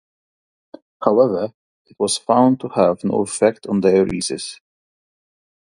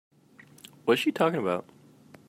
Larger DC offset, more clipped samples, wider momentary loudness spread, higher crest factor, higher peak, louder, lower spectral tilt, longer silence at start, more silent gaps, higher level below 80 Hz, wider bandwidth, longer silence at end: neither; neither; about the same, 10 LU vs 9 LU; about the same, 20 dB vs 20 dB; first, 0 dBFS vs -10 dBFS; first, -18 LUFS vs -27 LUFS; about the same, -5 dB/octave vs -5.5 dB/octave; first, 1 s vs 0.85 s; first, 1.54-1.85 s vs none; first, -56 dBFS vs -78 dBFS; second, 11.5 kHz vs 16 kHz; first, 1.2 s vs 0.65 s